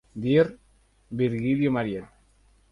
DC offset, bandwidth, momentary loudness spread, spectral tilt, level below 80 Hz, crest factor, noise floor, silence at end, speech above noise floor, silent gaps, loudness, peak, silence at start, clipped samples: under 0.1%; 10.5 kHz; 12 LU; -9 dB/octave; -56 dBFS; 18 dB; -61 dBFS; 0.65 s; 37 dB; none; -25 LUFS; -8 dBFS; 0.15 s; under 0.1%